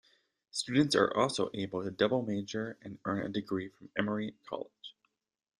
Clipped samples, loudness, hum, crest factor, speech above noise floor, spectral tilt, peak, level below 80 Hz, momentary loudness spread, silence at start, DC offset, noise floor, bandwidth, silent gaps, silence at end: under 0.1%; -33 LUFS; none; 22 dB; 47 dB; -5 dB/octave; -12 dBFS; -70 dBFS; 14 LU; 0.55 s; under 0.1%; -80 dBFS; 12 kHz; none; 0.7 s